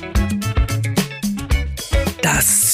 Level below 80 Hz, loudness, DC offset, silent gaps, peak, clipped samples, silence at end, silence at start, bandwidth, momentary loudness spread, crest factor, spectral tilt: -24 dBFS; -18 LUFS; under 0.1%; none; -4 dBFS; under 0.1%; 0 s; 0 s; 15.5 kHz; 8 LU; 14 dB; -3.5 dB/octave